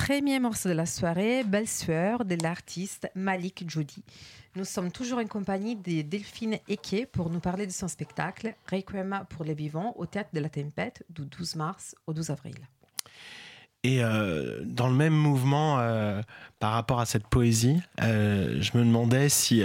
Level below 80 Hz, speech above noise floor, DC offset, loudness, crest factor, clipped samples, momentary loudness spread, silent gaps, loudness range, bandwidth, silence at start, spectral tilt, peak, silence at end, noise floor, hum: -54 dBFS; 22 dB; under 0.1%; -29 LUFS; 18 dB; under 0.1%; 15 LU; none; 8 LU; 16.5 kHz; 0 s; -5 dB/octave; -10 dBFS; 0 s; -50 dBFS; none